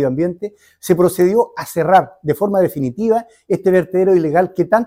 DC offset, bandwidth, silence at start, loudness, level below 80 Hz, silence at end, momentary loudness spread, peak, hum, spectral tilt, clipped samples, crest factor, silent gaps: under 0.1%; 16 kHz; 0 s; -16 LUFS; -54 dBFS; 0 s; 8 LU; 0 dBFS; none; -7 dB/octave; under 0.1%; 14 dB; none